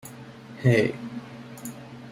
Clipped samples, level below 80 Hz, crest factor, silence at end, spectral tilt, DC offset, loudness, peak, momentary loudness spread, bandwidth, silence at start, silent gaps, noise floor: under 0.1%; -60 dBFS; 20 dB; 0 s; -6.5 dB/octave; under 0.1%; -24 LUFS; -8 dBFS; 21 LU; 16 kHz; 0.05 s; none; -43 dBFS